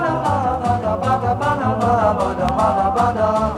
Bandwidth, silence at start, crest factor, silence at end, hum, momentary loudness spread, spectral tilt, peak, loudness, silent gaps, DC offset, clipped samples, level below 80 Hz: 12.5 kHz; 0 s; 14 dB; 0 s; none; 3 LU; -7 dB/octave; -4 dBFS; -18 LUFS; none; under 0.1%; under 0.1%; -36 dBFS